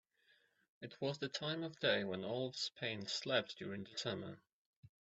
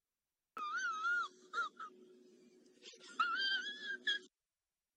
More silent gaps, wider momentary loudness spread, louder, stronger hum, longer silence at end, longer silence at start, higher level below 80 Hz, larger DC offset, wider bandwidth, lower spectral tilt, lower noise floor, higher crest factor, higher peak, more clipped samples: first, 4.52-4.83 s vs none; second, 12 LU vs 18 LU; about the same, -41 LUFS vs -39 LUFS; neither; second, 0.15 s vs 0.7 s; first, 0.8 s vs 0.55 s; first, -82 dBFS vs under -90 dBFS; neither; second, 8.2 kHz vs 10 kHz; first, -4 dB/octave vs 1 dB/octave; second, -75 dBFS vs under -90 dBFS; about the same, 22 dB vs 18 dB; first, -20 dBFS vs -26 dBFS; neither